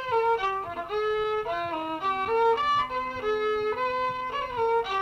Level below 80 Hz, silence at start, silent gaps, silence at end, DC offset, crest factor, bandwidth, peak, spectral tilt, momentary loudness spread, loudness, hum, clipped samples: -56 dBFS; 0 s; none; 0 s; under 0.1%; 12 dB; 8.2 kHz; -16 dBFS; -4.5 dB/octave; 6 LU; -27 LUFS; none; under 0.1%